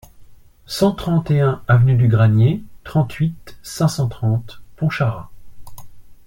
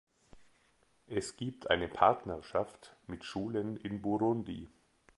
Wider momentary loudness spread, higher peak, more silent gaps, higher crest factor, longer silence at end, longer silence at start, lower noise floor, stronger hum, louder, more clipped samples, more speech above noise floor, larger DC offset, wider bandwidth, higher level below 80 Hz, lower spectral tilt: second, 12 LU vs 17 LU; first, -2 dBFS vs -10 dBFS; neither; second, 16 dB vs 26 dB; second, 0.1 s vs 0.5 s; second, 0.2 s vs 0.35 s; second, -42 dBFS vs -71 dBFS; neither; first, -18 LUFS vs -35 LUFS; neither; second, 26 dB vs 37 dB; neither; first, 16.5 kHz vs 11.5 kHz; first, -44 dBFS vs -60 dBFS; first, -7 dB/octave vs -5.5 dB/octave